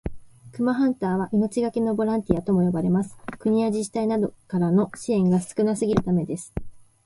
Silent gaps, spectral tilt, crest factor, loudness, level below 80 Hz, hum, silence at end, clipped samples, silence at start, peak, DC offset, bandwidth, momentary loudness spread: none; -7.5 dB/octave; 20 dB; -24 LUFS; -46 dBFS; none; 0.25 s; under 0.1%; 0.05 s; -4 dBFS; under 0.1%; 11.5 kHz; 9 LU